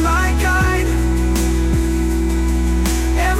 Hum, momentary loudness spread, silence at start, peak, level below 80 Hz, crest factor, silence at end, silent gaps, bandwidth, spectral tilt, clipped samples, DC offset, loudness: none; 3 LU; 0 s; -6 dBFS; -18 dBFS; 8 dB; 0 s; none; 16 kHz; -5.5 dB/octave; under 0.1%; under 0.1%; -17 LUFS